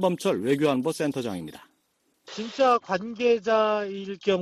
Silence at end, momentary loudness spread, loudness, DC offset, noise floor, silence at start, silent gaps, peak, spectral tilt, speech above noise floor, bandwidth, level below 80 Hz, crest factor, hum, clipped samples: 0 s; 14 LU; -25 LUFS; under 0.1%; -71 dBFS; 0 s; none; -10 dBFS; -5.5 dB/octave; 46 dB; 14 kHz; -68 dBFS; 16 dB; none; under 0.1%